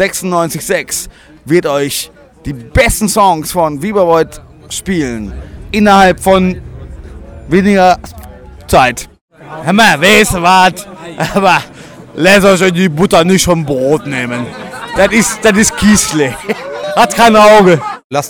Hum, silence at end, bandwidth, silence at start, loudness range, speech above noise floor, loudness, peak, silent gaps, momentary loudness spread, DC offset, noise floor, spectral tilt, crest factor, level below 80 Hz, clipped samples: none; 0 s; over 20 kHz; 0 s; 4 LU; 22 dB; -10 LUFS; 0 dBFS; 9.21-9.28 s, 18.04-18.10 s; 18 LU; under 0.1%; -31 dBFS; -4 dB/octave; 10 dB; -32 dBFS; under 0.1%